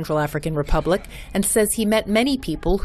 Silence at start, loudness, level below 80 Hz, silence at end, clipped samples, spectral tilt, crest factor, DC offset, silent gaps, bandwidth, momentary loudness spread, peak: 0 s; -21 LUFS; -30 dBFS; 0 s; under 0.1%; -4.5 dB/octave; 14 dB; under 0.1%; none; 13.5 kHz; 6 LU; -6 dBFS